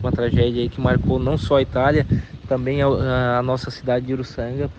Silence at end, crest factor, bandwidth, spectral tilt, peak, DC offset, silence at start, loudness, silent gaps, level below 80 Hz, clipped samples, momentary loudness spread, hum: 0 s; 16 dB; 8.2 kHz; -8 dB/octave; -4 dBFS; under 0.1%; 0 s; -20 LUFS; none; -34 dBFS; under 0.1%; 7 LU; none